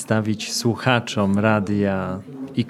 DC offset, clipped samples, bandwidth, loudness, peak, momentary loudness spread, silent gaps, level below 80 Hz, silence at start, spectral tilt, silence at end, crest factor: under 0.1%; under 0.1%; 13.5 kHz; -21 LUFS; -2 dBFS; 9 LU; none; -62 dBFS; 0 s; -5.5 dB/octave; 0 s; 20 dB